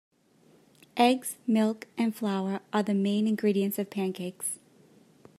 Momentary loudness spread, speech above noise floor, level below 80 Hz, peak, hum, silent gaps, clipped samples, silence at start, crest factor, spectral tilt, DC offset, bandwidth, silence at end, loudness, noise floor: 9 LU; 34 dB; -82 dBFS; -10 dBFS; none; none; under 0.1%; 0.95 s; 20 dB; -5 dB/octave; under 0.1%; 15 kHz; 0.85 s; -28 LUFS; -62 dBFS